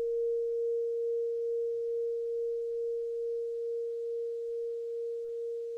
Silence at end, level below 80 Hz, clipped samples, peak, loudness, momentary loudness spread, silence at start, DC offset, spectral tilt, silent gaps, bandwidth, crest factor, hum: 0 s; -72 dBFS; under 0.1%; -28 dBFS; -34 LUFS; 5 LU; 0 s; under 0.1%; -4.5 dB/octave; none; 0.6 kHz; 6 dB; none